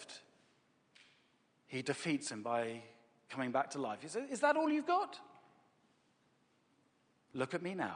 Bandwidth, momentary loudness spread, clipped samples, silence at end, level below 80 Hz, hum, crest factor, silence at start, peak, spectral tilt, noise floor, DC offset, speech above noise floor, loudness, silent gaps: 10 kHz; 17 LU; under 0.1%; 0 s; -88 dBFS; none; 22 dB; 0 s; -18 dBFS; -4.5 dB/octave; -75 dBFS; under 0.1%; 37 dB; -38 LUFS; none